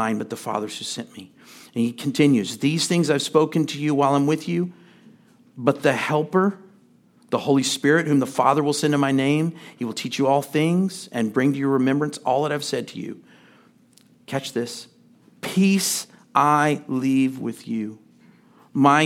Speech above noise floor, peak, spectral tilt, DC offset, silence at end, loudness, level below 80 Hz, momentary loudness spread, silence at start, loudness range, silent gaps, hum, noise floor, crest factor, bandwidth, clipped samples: 34 dB; -2 dBFS; -5 dB/octave; under 0.1%; 0 s; -22 LUFS; -74 dBFS; 12 LU; 0 s; 5 LU; none; none; -56 dBFS; 20 dB; 16.5 kHz; under 0.1%